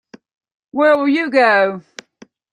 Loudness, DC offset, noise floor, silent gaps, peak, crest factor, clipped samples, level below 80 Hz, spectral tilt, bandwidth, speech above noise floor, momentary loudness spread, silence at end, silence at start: -14 LUFS; under 0.1%; -48 dBFS; none; -2 dBFS; 16 dB; under 0.1%; -68 dBFS; -5 dB/octave; 10 kHz; 34 dB; 13 LU; 0.75 s; 0.75 s